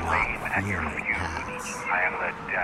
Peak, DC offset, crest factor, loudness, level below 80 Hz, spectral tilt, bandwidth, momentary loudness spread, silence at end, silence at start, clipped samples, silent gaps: -12 dBFS; under 0.1%; 16 dB; -27 LUFS; -44 dBFS; -4.5 dB/octave; 16 kHz; 7 LU; 0 s; 0 s; under 0.1%; none